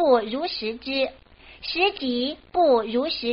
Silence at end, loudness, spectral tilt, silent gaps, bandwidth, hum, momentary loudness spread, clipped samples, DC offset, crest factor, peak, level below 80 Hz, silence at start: 0 s; -24 LUFS; -1 dB/octave; none; 5.6 kHz; none; 9 LU; under 0.1%; under 0.1%; 16 dB; -6 dBFS; -56 dBFS; 0 s